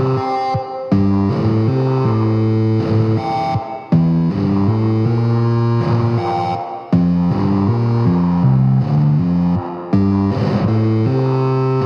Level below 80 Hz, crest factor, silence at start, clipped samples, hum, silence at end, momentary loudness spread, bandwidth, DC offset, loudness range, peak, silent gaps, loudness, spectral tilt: -44 dBFS; 12 dB; 0 s; under 0.1%; none; 0 s; 4 LU; 6.6 kHz; under 0.1%; 1 LU; -2 dBFS; none; -16 LUFS; -10 dB/octave